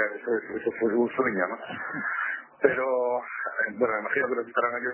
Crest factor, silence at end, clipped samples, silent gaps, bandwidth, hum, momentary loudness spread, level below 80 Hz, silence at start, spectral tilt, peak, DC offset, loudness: 22 dB; 0 s; under 0.1%; none; 3.2 kHz; none; 6 LU; -70 dBFS; 0 s; -9 dB/octave; -6 dBFS; under 0.1%; -27 LUFS